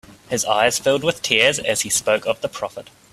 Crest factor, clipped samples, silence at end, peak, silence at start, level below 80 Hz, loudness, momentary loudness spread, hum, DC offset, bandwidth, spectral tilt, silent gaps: 20 dB; under 0.1%; 0.3 s; 0 dBFS; 0.1 s; -56 dBFS; -19 LUFS; 12 LU; none; under 0.1%; 15.5 kHz; -1.5 dB/octave; none